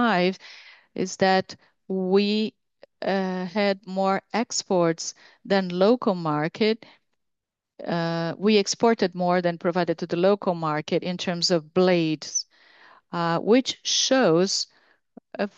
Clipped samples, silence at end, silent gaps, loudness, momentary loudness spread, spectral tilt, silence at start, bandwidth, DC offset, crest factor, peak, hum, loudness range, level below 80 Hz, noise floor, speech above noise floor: under 0.1%; 0.1 s; none; -24 LUFS; 11 LU; -4.5 dB/octave; 0 s; 8.4 kHz; under 0.1%; 18 dB; -6 dBFS; none; 3 LU; -74 dBFS; -83 dBFS; 60 dB